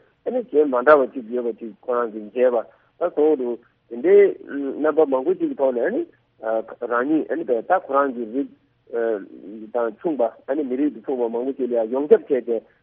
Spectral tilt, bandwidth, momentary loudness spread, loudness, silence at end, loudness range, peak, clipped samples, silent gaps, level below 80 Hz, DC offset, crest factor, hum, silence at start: -5 dB/octave; 3.7 kHz; 12 LU; -21 LUFS; 0.2 s; 4 LU; -2 dBFS; under 0.1%; none; -72 dBFS; under 0.1%; 20 dB; none; 0.25 s